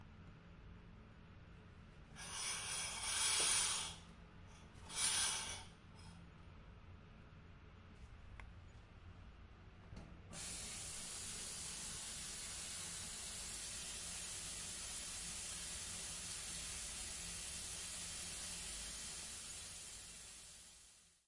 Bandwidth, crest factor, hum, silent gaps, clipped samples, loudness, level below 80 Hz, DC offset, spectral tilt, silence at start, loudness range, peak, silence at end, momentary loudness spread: 11.5 kHz; 24 dB; none; none; under 0.1%; -43 LUFS; -62 dBFS; under 0.1%; -0.5 dB/octave; 0 s; 19 LU; -24 dBFS; 0.15 s; 23 LU